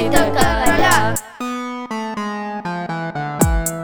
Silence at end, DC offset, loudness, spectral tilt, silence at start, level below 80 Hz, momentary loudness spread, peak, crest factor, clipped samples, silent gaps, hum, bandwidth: 0 s; under 0.1%; -19 LUFS; -4 dB/octave; 0 s; -28 dBFS; 11 LU; 0 dBFS; 18 dB; under 0.1%; none; none; over 20 kHz